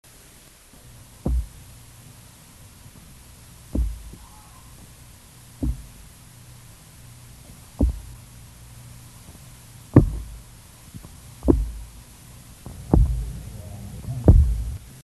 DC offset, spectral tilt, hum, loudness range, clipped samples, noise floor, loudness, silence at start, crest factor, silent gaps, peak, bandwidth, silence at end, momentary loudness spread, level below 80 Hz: under 0.1%; -8 dB/octave; none; 13 LU; under 0.1%; -49 dBFS; -24 LUFS; 1.25 s; 26 dB; none; 0 dBFS; 13 kHz; 0.15 s; 27 LU; -28 dBFS